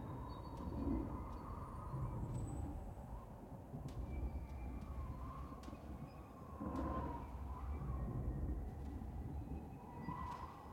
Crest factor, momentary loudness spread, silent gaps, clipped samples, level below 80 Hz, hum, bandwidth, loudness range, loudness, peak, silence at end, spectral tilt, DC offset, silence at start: 16 dB; 9 LU; none; under 0.1%; -50 dBFS; none; 16.5 kHz; 4 LU; -48 LUFS; -30 dBFS; 0 s; -8.5 dB/octave; under 0.1%; 0 s